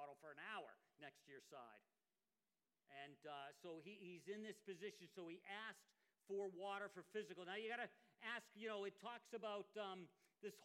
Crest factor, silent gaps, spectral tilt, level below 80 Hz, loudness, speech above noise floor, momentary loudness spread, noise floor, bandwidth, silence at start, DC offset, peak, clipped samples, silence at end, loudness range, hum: 18 dB; none; -4 dB/octave; under -90 dBFS; -54 LUFS; over 36 dB; 12 LU; under -90 dBFS; 16 kHz; 0 s; under 0.1%; -36 dBFS; under 0.1%; 0 s; 9 LU; none